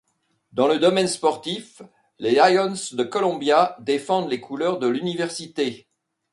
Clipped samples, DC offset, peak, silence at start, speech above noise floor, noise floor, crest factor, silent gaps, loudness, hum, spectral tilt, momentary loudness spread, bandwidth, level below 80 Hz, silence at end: under 0.1%; under 0.1%; -2 dBFS; 0.55 s; 45 dB; -66 dBFS; 20 dB; none; -22 LUFS; none; -4 dB/octave; 11 LU; 11.5 kHz; -70 dBFS; 0.55 s